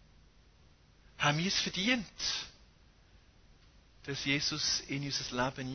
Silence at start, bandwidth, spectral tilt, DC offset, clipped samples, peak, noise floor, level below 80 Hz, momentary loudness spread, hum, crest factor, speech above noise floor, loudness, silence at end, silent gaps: 1.2 s; 6.6 kHz; -3 dB/octave; under 0.1%; under 0.1%; -16 dBFS; -63 dBFS; -60 dBFS; 8 LU; none; 22 dB; 28 dB; -32 LUFS; 0 s; none